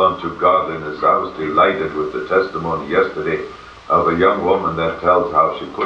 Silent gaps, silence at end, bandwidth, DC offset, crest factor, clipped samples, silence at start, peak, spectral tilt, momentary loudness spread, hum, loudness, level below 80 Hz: none; 0 s; 7.6 kHz; under 0.1%; 16 dB; under 0.1%; 0 s; -2 dBFS; -7 dB/octave; 8 LU; none; -17 LUFS; -46 dBFS